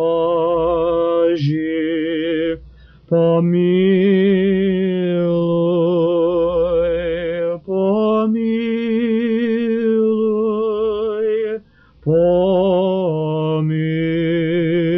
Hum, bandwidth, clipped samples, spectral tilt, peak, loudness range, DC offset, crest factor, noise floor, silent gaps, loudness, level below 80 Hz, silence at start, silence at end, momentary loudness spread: none; 5.6 kHz; under 0.1%; -7 dB/octave; -6 dBFS; 2 LU; under 0.1%; 12 dB; -43 dBFS; none; -17 LUFS; -46 dBFS; 0 s; 0 s; 6 LU